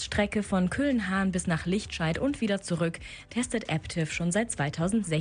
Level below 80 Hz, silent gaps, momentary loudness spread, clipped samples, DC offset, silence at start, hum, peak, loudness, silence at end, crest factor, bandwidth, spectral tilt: -48 dBFS; none; 4 LU; under 0.1%; under 0.1%; 0 s; none; -12 dBFS; -29 LUFS; 0 s; 16 dB; 10.5 kHz; -5 dB/octave